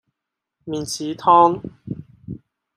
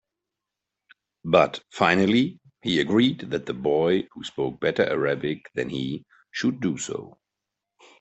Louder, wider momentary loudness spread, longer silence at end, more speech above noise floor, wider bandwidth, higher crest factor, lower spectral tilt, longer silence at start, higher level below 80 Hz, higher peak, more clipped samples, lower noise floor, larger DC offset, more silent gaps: first, -18 LUFS vs -24 LUFS; first, 24 LU vs 12 LU; second, 0.4 s vs 0.9 s; about the same, 65 dB vs 62 dB; first, 15.5 kHz vs 8.4 kHz; about the same, 20 dB vs 22 dB; about the same, -5 dB/octave vs -5.5 dB/octave; second, 0.65 s vs 1.25 s; about the same, -58 dBFS vs -62 dBFS; about the same, -2 dBFS vs -2 dBFS; neither; about the same, -83 dBFS vs -86 dBFS; neither; neither